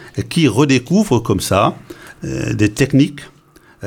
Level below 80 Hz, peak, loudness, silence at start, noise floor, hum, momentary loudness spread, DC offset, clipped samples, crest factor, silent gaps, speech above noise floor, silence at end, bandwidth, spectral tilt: -42 dBFS; 0 dBFS; -15 LUFS; 0 s; -46 dBFS; none; 16 LU; under 0.1%; under 0.1%; 16 dB; none; 31 dB; 0 s; 17.5 kHz; -6 dB/octave